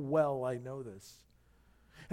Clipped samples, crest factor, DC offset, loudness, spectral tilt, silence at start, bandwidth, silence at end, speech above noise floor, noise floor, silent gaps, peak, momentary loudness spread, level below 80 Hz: under 0.1%; 20 dB; under 0.1%; -36 LUFS; -7.5 dB/octave; 0 s; 15.5 kHz; 0 s; 31 dB; -66 dBFS; none; -18 dBFS; 24 LU; -68 dBFS